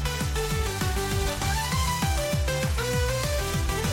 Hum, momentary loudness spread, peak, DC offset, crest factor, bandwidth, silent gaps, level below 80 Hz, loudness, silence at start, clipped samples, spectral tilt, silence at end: none; 2 LU; -14 dBFS; under 0.1%; 12 dB; 17 kHz; none; -32 dBFS; -27 LUFS; 0 s; under 0.1%; -4 dB/octave; 0 s